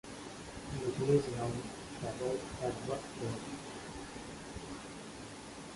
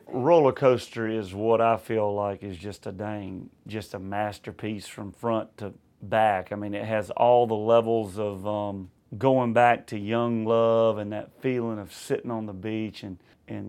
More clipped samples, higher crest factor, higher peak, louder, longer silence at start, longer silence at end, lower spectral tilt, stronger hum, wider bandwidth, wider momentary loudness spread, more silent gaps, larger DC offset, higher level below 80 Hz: neither; about the same, 22 dB vs 20 dB; second, -18 dBFS vs -6 dBFS; second, -39 LUFS vs -26 LUFS; about the same, 0.05 s vs 0.05 s; about the same, 0 s vs 0 s; second, -5.5 dB/octave vs -7 dB/octave; neither; second, 11.5 kHz vs 14.5 kHz; about the same, 15 LU vs 17 LU; neither; neither; first, -58 dBFS vs -68 dBFS